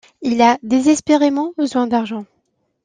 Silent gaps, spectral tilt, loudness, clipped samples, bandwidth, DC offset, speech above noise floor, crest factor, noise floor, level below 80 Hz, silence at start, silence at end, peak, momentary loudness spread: none; -4 dB/octave; -16 LUFS; under 0.1%; 9.8 kHz; under 0.1%; 52 dB; 14 dB; -67 dBFS; -58 dBFS; 0.2 s; 0.6 s; -2 dBFS; 7 LU